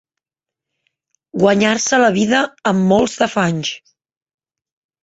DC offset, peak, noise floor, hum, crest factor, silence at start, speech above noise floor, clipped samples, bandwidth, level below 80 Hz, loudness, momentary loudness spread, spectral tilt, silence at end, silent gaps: under 0.1%; -2 dBFS; -86 dBFS; none; 16 dB; 1.35 s; 72 dB; under 0.1%; 8.2 kHz; -54 dBFS; -15 LUFS; 10 LU; -4.5 dB/octave; 1.25 s; none